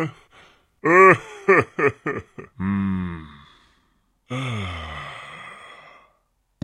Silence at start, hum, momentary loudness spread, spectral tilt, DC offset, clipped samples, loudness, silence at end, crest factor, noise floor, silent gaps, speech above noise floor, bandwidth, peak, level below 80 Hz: 0 s; none; 24 LU; -6.5 dB/octave; under 0.1%; under 0.1%; -20 LUFS; 0.95 s; 22 dB; -68 dBFS; none; 48 dB; 10.5 kHz; -2 dBFS; -54 dBFS